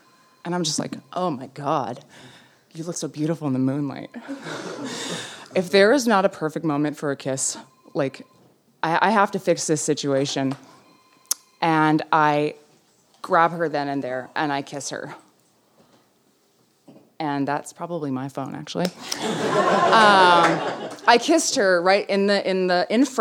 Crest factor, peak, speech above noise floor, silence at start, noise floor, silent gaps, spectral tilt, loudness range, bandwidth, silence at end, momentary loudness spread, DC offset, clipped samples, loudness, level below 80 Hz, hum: 22 dB; -2 dBFS; 41 dB; 0.45 s; -62 dBFS; none; -4 dB/octave; 13 LU; 18 kHz; 0 s; 15 LU; under 0.1%; under 0.1%; -22 LUFS; -76 dBFS; none